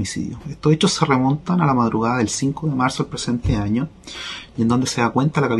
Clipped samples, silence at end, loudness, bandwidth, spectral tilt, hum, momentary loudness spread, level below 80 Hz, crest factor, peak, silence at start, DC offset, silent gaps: under 0.1%; 0 s; -20 LUFS; 12 kHz; -5.5 dB/octave; none; 12 LU; -40 dBFS; 18 dB; -2 dBFS; 0 s; under 0.1%; none